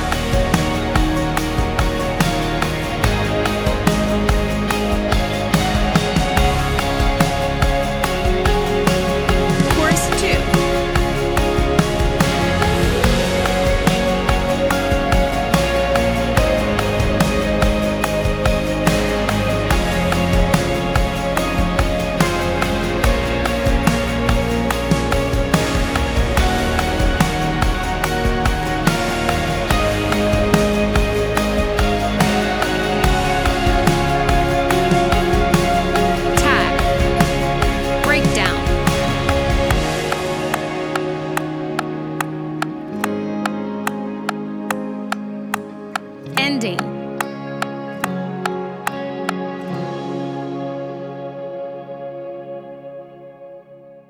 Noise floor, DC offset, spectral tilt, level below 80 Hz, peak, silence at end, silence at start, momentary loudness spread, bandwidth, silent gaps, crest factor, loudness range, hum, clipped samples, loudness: -42 dBFS; under 0.1%; -5 dB/octave; -24 dBFS; 0 dBFS; 0.1 s; 0 s; 9 LU; over 20 kHz; none; 18 dB; 8 LU; none; under 0.1%; -18 LUFS